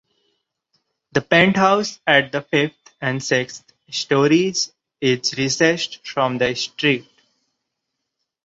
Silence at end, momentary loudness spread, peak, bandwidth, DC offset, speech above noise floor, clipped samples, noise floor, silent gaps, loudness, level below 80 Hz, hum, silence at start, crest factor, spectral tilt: 1.45 s; 11 LU; -2 dBFS; 8 kHz; under 0.1%; 60 dB; under 0.1%; -79 dBFS; none; -19 LUFS; -60 dBFS; none; 1.15 s; 20 dB; -4 dB/octave